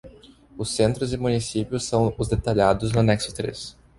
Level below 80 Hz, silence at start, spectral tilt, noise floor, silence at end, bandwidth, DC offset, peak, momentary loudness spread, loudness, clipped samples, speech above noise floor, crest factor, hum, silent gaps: -42 dBFS; 0.05 s; -5.5 dB/octave; -49 dBFS; 0.25 s; 11.5 kHz; under 0.1%; -4 dBFS; 10 LU; -23 LUFS; under 0.1%; 26 dB; 20 dB; none; none